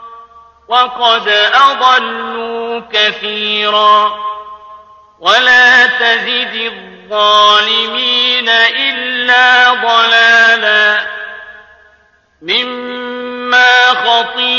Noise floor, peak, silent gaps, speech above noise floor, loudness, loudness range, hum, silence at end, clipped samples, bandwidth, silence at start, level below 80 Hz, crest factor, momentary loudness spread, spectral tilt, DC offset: -50 dBFS; 0 dBFS; none; 40 dB; -9 LUFS; 5 LU; none; 0 s; under 0.1%; 8.4 kHz; 0 s; -56 dBFS; 12 dB; 15 LU; -1 dB/octave; under 0.1%